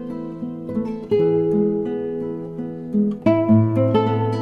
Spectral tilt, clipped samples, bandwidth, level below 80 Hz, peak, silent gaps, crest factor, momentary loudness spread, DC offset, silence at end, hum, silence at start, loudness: -10 dB/octave; under 0.1%; 5.6 kHz; -54 dBFS; -4 dBFS; none; 16 dB; 14 LU; under 0.1%; 0 s; none; 0 s; -21 LUFS